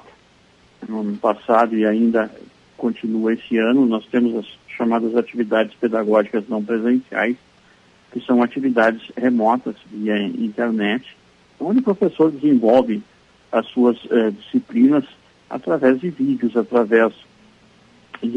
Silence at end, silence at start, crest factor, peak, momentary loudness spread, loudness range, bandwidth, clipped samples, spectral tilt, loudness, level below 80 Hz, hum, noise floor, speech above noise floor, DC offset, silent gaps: 0 s; 0.8 s; 16 dB; -2 dBFS; 11 LU; 2 LU; 6.6 kHz; under 0.1%; -7.5 dB/octave; -19 LUFS; -66 dBFS; none; -53 dBFS; 35 dB; under 0.1%; none